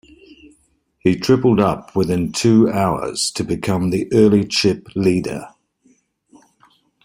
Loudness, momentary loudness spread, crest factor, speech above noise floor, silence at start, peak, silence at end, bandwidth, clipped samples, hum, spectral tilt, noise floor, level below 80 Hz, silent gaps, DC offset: -17 LUFS; 7 LU; 16 dB; 45 dB; 1.05 s; -2 dBFS; 1.55 s; 16 kHz; under 0.1%; none; -5.5 dB/octave; -61 dBFS; -48 dBFS; none; under 0.1%